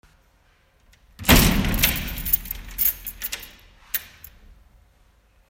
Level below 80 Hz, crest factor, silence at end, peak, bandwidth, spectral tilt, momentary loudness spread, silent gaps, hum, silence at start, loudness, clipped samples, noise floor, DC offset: -32 dBFS; 22 dB; 1.4 s; -2 dBFS; 16.5 kHz; -3.5 dB/octave; 16 LU; none; none; 1.2 s; -21 LUFS; under 0.1%; -60 dBFS; under 0.1%